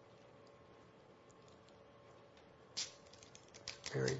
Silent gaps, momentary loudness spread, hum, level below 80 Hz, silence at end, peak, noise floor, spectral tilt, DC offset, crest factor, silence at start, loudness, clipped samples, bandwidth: none; 18 LU; none; -76 dBFS; 0 s; -22 dBFS; -63 dBFS; -4 dB/octave; under 0.1%; 28 dB; 0 s; -47 LUFS; under 0.1%; 7.6 kHz